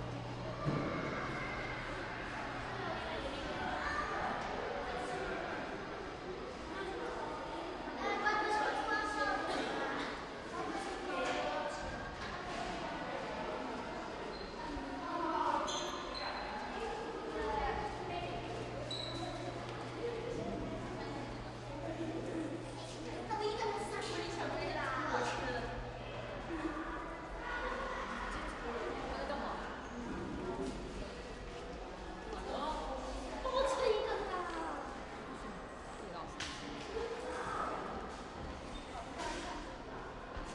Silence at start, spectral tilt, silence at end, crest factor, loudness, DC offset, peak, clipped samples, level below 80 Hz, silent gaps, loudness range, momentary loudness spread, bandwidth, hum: 0 s; -4.5 dB/octave; 0 s; 20 dB; -40 LUFS; under 0.1%; -20 dBFS; under 0.1%; -54 dBFS; none; 6 LU; 10 LU; 12 kHz; none